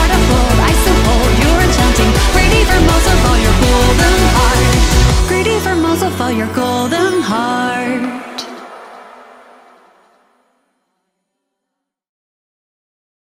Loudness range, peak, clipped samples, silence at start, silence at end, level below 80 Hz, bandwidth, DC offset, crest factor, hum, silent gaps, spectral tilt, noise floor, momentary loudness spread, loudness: 12 LU; 0 dBFS; under 0.1%; 0 s; 4.25 s; -18 dBFS; 16.5 kHz; under 0.1%; 12 dB; none; none; -4.5 dB/octave; -77 dBFS; 7 LU; -12 LUFS